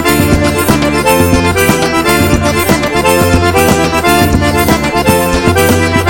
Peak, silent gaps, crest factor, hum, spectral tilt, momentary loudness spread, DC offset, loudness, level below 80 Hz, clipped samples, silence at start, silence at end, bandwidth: 0 dBFS; none; 10 dB; none; -4.5 dB/octave; 2 LU; under 0.1%; -9 LUFS; -24 dBFS; 0.5%; 0 s; 0 s; 17.5 kHz